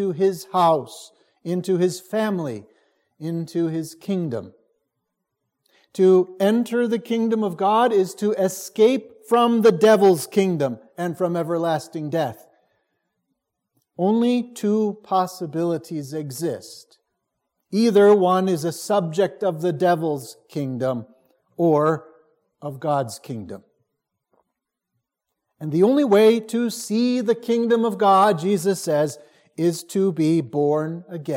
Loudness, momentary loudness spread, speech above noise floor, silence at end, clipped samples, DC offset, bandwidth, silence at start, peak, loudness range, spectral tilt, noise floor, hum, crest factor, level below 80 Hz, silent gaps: -21 LUFS; 15 LU; 61 dB; 0 s; under 0.1%; under 0.1%; 16.5 kHz; 0 s; -4 dBFS; 8 LU; -6 dB/octave; -81 dBFS; none; 18 dB; -74 dBFS; none